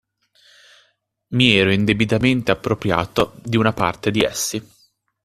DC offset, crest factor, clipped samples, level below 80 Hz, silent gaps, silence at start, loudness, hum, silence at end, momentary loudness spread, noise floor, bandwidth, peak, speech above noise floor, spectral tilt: under 0.1%; 20 dB; under 0.1%; -48 dBFS; none; 1.3 s; -18 LUFS; none; 0.6 s; 8 LU; -64 dBFS; 14.5 kHz; 0 dBFS; 46 dB; -4.5 dB/octave